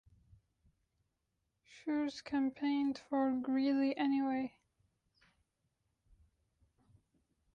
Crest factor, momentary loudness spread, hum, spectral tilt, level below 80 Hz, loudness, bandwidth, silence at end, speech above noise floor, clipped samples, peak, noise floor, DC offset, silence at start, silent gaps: 16 dB; 6 LU; none; -5.5 dB/octave; -76 dBFS; -36 LUFS; 7.2 kHz; 3.05 s; 50 dB; under 0.1%; -24 dBFS; -85 dBFS; under 0.1%; 1.75 s; none